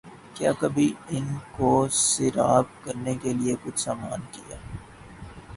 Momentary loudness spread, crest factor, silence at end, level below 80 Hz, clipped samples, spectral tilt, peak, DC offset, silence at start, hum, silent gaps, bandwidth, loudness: 20 LU; 20 dB; 0 s; -52 dBFS; under 0.1%; -4.5 dB/octave; -6 dBFS; under 0.1%; 0.05 s; none; none; 11.5 kHz; -25 LUFS